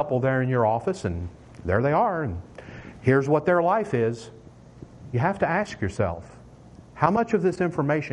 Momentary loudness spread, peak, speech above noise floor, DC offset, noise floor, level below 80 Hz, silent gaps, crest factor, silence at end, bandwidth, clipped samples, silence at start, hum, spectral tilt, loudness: 17 LU; -4 dBFS; 24 dB; under 0.1%; -47 dBFS; -52 dBFS; none; 20 dB; 0 s; 10.5 kHz; under 0.1%; 0 s; none; -8 dB/octave; -24 LUFS